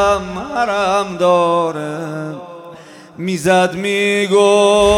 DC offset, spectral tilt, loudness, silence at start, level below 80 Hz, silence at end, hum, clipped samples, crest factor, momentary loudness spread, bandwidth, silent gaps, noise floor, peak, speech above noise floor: under 0.1%; -4.5 dB/octave; -15 LUFS; 0 s; -40 dBFS; 0 s; none; under 0.1%; 14 dB; 15 LU; 15.5 kHz; none; -37 dBFS; -2 dBFS; 23 dB